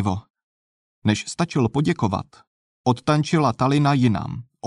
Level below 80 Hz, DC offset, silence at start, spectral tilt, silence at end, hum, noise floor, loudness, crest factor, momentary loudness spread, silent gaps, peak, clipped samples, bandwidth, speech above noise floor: -52 dBFS; under 0.1%; 0 s; -6.5 dB/octave; 0 s; none; under -90 dBFS; -22 LUFS; 16 dB; 9 LU; 0.30-0.34 s, 0.43-1.02 s, 2.47-2.84 s; -6 dBFS; under 0.1%; 11 kHz; over 69 dB